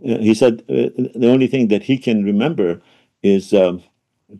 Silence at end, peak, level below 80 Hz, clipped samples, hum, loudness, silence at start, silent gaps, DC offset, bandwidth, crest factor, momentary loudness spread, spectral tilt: 0 s; -2 dBFS; -60 dBFS; under 0.1%; none; -16 LUFS; 0.05 s; none; under 0.1%; 12 kHz; 14 dB; 7 LU; -7 dB/octave